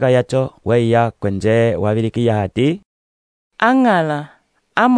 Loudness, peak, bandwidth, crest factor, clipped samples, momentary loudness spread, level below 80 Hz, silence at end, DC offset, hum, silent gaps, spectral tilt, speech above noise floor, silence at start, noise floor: -17 LUFS; 0 dBFS; 10 kHz; 16 dB; under 0.1%; 7 LU; -50 dBFS; 0 s; under 0.1%; none; 2.85-3.51 s; -7.5 dB/octave; over 75 dB; 0 s; under -90 dBFS